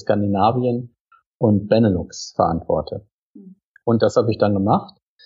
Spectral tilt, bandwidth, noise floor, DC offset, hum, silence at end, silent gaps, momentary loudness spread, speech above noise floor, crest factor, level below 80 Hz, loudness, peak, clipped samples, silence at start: -7.5 dB/octave; 7.8 kHz; -45 dBFS; under 0.1%; none; 0.4 s; 1.00-1.06 s, 1.26-1.40 s, 3.12-3.35 s, 3.64-3.75 s; 11 LU; 27 dB; 18 dB; -48 dBFS; -19 LUFS; -2 dBFS; under 0.1%; 0.05 s